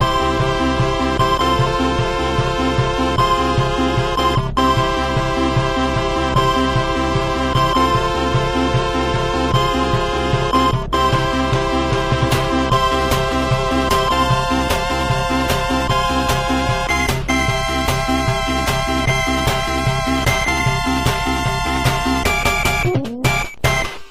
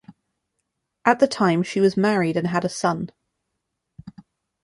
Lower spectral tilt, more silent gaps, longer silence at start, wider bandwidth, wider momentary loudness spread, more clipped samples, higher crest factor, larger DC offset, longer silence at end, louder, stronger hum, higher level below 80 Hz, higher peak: about the same, -5 dB/octave vs -6 dB/octave; neither; about the same, 0 s vs 0.1 s; first, 16 kHz vs 11.5 kHz; second, 3 LU vs 6 LU; neither; second, 12 dB vs 22 dB; neither; second, 0 s vs 0.55 s; first, -17 LUFS vs -21 LUFS; neither; first, -26 dBFS vs -62 dBFS; about the same, -4 dBFS vs -2 dBFS